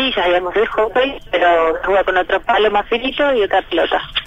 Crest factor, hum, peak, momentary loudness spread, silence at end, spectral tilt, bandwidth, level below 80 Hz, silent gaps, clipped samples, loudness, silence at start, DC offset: 12 dB; none; -4 dBFS; 3 LU; 0 s; -4.5 dB/octave; 8.4 kHz; -40 dBFS; none; under 0.1%; -16 LUFS; 0 s; under 0.1%